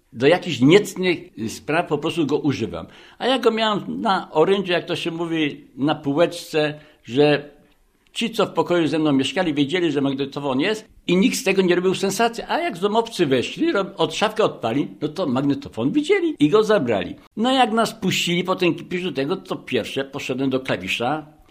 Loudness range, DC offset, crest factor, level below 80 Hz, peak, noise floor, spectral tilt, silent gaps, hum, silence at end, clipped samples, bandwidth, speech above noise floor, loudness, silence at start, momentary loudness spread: 3 LU; under 0.1%; 20 dB; -58 dBFS; -2 dBFS; -58 dBFS; -5 dB/octave; 17.27-17.31 s; none; 0.25 s; under 0.1%; 15.5 kHz; 37 dB; -21 LUFS; 0.15 s; 8 LU